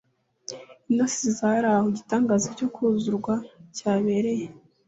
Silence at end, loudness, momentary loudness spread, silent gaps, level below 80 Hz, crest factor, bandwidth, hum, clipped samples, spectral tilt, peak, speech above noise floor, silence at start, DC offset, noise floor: 0.3 s; -25 LUFS; 17 LU; none; -66 dBFS; 16 dB; 8 kHz; none; under 0.1%; -5 dB/octave; -10 dBFS; 20 dB; 0.5 s; under 0.1%; -44 dBFS